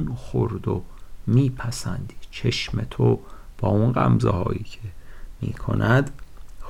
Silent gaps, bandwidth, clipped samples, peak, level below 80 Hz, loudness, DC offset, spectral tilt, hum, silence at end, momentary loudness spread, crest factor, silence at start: none; 12.5 kHz; under 0.1%; -8 dBFS; -38 dBFS; -24 LUFS; under 0.1%; -7 dB/octave; none; 0 s; 14 LU; 14 dB; 0 s